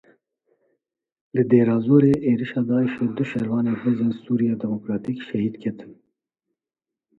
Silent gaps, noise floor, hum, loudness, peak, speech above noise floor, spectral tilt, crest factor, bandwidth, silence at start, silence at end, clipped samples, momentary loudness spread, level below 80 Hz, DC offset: none; -82 dBFS; none; -22 LUFS; -4 dBFS; 61 dB; -9.5 dB/octave; 20 dB; 4.6 kHz; 1.35 s; 1.25 s; under 0.1%; 11 LU; -60 dBFS; under 0.1%